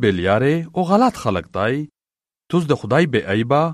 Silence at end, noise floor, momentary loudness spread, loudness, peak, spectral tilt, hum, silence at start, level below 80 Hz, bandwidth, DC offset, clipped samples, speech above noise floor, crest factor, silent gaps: 0 s; under -90 dBFS; 6 LU; -19 LUFS; -2 dBFS; -7 dB/octave; none; 0 s; -50 dBFS; 13 kHz; under 0.1%; under 0.1%; over 72 dB; 16 dB; none